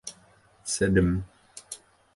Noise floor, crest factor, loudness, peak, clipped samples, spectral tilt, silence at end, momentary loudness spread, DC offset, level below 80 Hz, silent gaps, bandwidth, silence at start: -59 dBFS; 20 dB; -26 LUFS; -8 dBFS; under 0.1%; -5 dB/octave; 0.4 s; 20 LU; under 0.1%; -42 dBFS; none; 11.5 kHz; 0.05 s